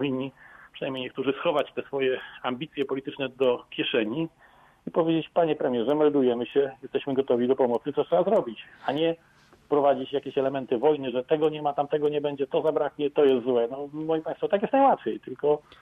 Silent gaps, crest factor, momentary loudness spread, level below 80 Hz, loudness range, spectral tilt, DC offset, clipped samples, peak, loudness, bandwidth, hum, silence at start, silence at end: none; 16 dB; 10 LU; -68 dBFS; 4 LU; -8 dB/octave; under 0.1%; under 0.1%; -10 dBFS; -26 LUFS; 4.4 kHz; none; 0 s; 0.2 s